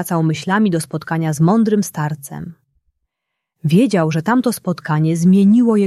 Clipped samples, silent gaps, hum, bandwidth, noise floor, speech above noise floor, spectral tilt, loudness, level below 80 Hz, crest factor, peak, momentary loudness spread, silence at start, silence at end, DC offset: under 0.1%; none; none; 14 kHz; -78 dBFS; 63 dB; -7 dB/octave; -16 LUFS; -58 dBFS; 14 dB; -2 dBFS; 12 LU; 0 s; 0 s; under 0.1%